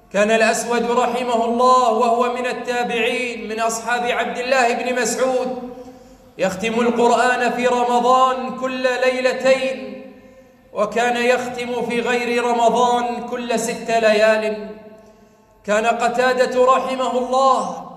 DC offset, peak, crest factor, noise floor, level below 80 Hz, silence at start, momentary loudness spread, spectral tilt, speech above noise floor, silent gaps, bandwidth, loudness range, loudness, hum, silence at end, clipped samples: under 0.1%; -4 dBFS; 16 dB; -51 dBFS; -58 dBFS; 0.15 s; 9 LU; -3.5 dB/octave; 33 dB; none; 14.5 kHz; 3 LU; -18 LUFS; none; 0 s; under 0.1%